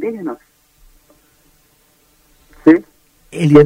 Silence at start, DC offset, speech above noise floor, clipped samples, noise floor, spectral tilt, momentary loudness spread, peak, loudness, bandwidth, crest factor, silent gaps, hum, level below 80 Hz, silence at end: 0 s; under 0.1%; 44 dB; 0.1%; -55 dBFS; -8.5 dB/octave; 20 LU; 0 dBFS; -15 LUFS; 11.5 kHz; 16 dB; none; none; -48 dBFS; 0 s